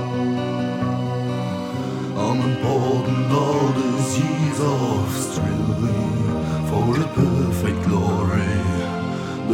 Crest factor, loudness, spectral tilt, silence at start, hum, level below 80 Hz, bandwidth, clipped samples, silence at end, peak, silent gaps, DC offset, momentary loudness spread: 14 dB; -21 LUFS; -6.5 dB/octave; 0 s; none; -42 dBFS; 16.5 kHz; under 0.1%; 0 s; -6 dBFS; none; under 0.1%; 6 LU